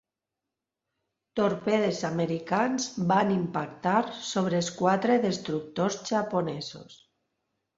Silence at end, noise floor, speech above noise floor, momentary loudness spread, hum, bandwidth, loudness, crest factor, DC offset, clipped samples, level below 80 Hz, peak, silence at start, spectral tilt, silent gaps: 0.8 s; -87 dBFS; 60 dB; 8 LU; none; 8 kHz; -28 LUFS; 20 dB; under 0.1%; under 0.1%; -68 dBFS; -10 dBFS; 1.35 s; -5 dB/octave; none